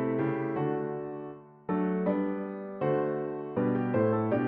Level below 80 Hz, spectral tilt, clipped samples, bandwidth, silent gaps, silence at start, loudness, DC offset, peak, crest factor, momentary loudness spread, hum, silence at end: -68 dBFS; -8.5 dB/octave; under 0.1%; 4.3 kHz; none; 0 s; -31 LUFS; under 0.1%; -16 dBFS; 14 dB; 11 LU; none; 0 s